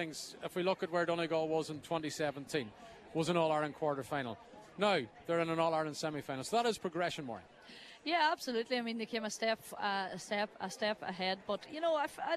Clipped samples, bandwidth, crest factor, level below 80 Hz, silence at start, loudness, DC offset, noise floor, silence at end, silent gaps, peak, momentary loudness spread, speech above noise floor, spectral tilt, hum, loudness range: under 0.1%; 14 kHz; 18 dB; -74 dBFS; 0 s; -36 LUFS; under 0.1%; -55 dBFS; 0 s; none; -18 dBFS; 11 LU; 19 dB; -4.5 dB/octave; none; 2 LU